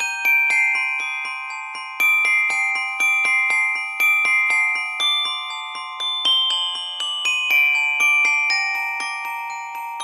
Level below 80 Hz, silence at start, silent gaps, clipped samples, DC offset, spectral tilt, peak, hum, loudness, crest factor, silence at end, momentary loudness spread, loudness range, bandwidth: under -90 dBFS; 0 s; none; under 0.1%; under 0.1%; 3.5 dB/octave; -8 dBFS; none; -17 LUFS; 12 dB; 0 s; 13 LU; 2 LU; 13 kHz